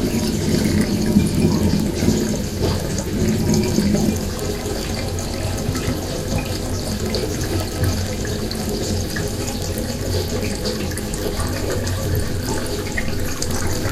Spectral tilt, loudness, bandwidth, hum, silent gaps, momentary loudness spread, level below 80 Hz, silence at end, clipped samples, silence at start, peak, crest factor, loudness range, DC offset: -5 dB/octave; -21 LUFS; 16 kHz; none; none; 6 LU; -30 dBFS; 0 s; under 0.1%; 0 s; 0 dBFS; 20 dB; 4 LU; under 0.1%